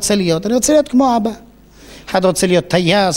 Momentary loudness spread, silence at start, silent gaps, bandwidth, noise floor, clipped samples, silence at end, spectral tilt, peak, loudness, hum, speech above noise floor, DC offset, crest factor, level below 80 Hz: 10 LU; 0 s; none; 16.5 kHz; -41 dBFS; under 0.1%; 0 s; -4.5 dB/octave; -2 dBFS; -14 LUFS; 50 Hz at -45 dBFS; 27 dB; under 0.1%; 14 dB; -42 dBFS